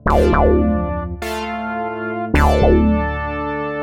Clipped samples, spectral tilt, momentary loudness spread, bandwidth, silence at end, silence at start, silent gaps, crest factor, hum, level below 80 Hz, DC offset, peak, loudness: under 0.1%; -7.5 dB/octave; 10 LU; 16 kHz; 0 s; 0.05 s; none; 16 dB; none; -22 dBFS; under 0.1%; -2 dBFS; -18 LUFS